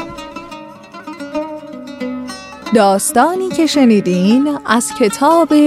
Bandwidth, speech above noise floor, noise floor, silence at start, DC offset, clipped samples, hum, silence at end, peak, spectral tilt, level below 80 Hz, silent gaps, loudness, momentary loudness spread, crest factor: 15.5 kHz; 22 dB; -34 dBFS; 0 s; under 0.1%; under 0.1%; none; 0 s; 0 dBFS; -4.5 dB/octave; -52 dBFS; none; -13 LUFS; 19 LU; 14 dB